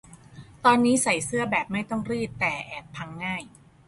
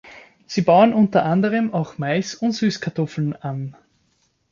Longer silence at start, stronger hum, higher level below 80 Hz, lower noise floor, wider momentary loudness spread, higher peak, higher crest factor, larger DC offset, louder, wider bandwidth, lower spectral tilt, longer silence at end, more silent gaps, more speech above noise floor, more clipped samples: about the same, 0.1 s vs 0.05 s; neither; about the same, -58 dBFS vs -60 dBFS; second, -47 dBFS vs -65 dBFS; about the same, 15 LU vs 13 LU; second, -6 dBFS vs -2 dBFS; about the same, 22 dB vs 18 dB; neither; second, -25 LUFS vs -20 LUFS; first, 11.5 kHz vs 7.4 kHz; second, -4 dB/octave vs -6.5 dB/octave; second, 0.4 s vs 0.8 s; neither; second, 22 dB vs 46 dB; neither